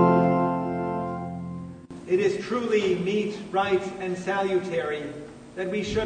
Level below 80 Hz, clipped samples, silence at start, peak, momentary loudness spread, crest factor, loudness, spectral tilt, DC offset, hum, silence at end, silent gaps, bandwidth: -56 dBFS; under 0.1%; 0 s; -6 dBFS; 14 LU; 20 dB; -26 LUFS; -6.5 dB/octave; under 0.1%; none; 0 s; none; 9.6 kHz